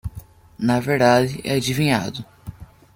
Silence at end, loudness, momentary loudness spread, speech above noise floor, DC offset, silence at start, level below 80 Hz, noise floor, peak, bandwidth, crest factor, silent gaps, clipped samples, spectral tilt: 0.3 s; -20 LUFS; 22 LU; 22 dB; under 0.1%; 0.05 s; -46 dBFS; -41 dBFS; -4 dBFS; 17 kHz; 18 dB; none; under 0.1%; -5.5 dB/octave